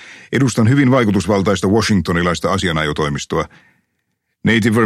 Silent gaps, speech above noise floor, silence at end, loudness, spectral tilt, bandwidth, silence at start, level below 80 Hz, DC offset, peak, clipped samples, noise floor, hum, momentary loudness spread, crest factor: none; 56 dB; 0 s; -16 LUFS; -5.5 dB/octave; 14 kHz; 0 s; -40 dBFS; under 0.1%; -2 dBFS; under 0.1%; -71 dBFS; none; 8 LU; 14 dB